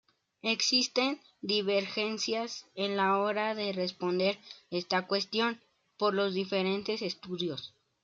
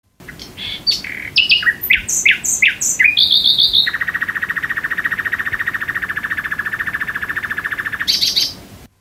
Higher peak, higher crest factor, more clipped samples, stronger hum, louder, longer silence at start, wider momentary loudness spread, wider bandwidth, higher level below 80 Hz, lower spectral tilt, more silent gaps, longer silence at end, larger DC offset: second, -14 dBFS vs 0 dBFS; about the same, 18 dB vs 18 dB; neither; neither; second, -31 LUFS vs -15 LUFS; first, 0.45 s vs 0.2 s; about the same, 10 LU vs 11 LU; second, 7.8 kHz vs 16 kHz; second, -80 dBFS vs -46 dBFS; first, -3.5 dB/octave vs 1 dB/octave; neither; first, 0.35 s vs 0.15 s; neither